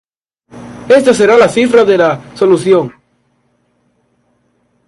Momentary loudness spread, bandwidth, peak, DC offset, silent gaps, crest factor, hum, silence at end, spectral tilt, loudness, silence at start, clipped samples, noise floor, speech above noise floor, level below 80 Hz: 13 LU; 11.5 kHz; 0 dBFS; under 0.1%; none; 12 dB; 60 Hz at -40 dBFS; 1.95 s; -5 dB/octave; -9 LUFS; 0.55 s; under 0.1%; -58 dBFS; 50 dB; -52 dBFS